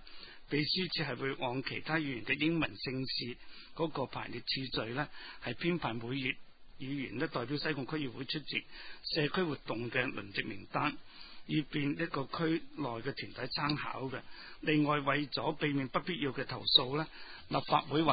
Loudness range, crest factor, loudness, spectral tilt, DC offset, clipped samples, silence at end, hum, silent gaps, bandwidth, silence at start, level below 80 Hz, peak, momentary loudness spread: 5 LU; 24 dB; -35 LUFS; -9 dB/octave; under 0.1%; under 0.1%; 0 s; none; none; 5 kHz; 0 s; -62 dBFS; -12 dBFS; 11 LU